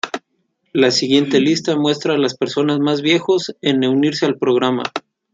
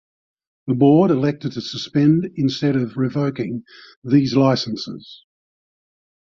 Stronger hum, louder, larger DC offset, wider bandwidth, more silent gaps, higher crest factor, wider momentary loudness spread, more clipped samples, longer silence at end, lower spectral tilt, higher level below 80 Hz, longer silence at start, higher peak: neither; about the same, -17 LUFS vs -19 LUFS; neither; first, 9 kHz vs 7.2 kHz; second, none vs 3.96-4.02 s; about the same, 16 dB vs 16 dB; second, 8 LU vs 16 LU; neither; second, 0.35 s vs 1.15 s; second, -5 dB/octave vs -7.5 dB/octave; second, -64 dBFS vs -58 dBFS; second, 0.05 s vs 0.65 s; about the same, -2 dBFS vs -2 dBFS